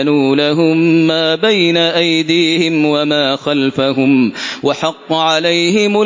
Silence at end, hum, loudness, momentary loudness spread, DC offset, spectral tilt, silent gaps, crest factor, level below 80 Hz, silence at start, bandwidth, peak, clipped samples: 0 s; none; -12 LUFS; 5 LU; under 0.1%; -5 dB/octave; none; 12 dB; -58 dBFS; 0 s; 7.6 kHz; 0 dBFS; under 0.1%